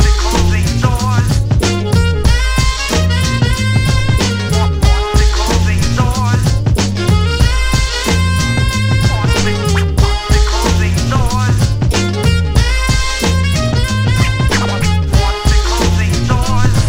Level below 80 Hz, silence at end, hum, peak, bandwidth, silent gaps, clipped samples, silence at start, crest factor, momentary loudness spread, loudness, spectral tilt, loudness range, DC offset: -16 dBFS; 0 s; none; 0 dBFS; 16 kHz; none; under 0.1%; 0 s; 12 dB; 1 LU; -13 LUFS; -5 dB/octave; 0 LU; under 0.1%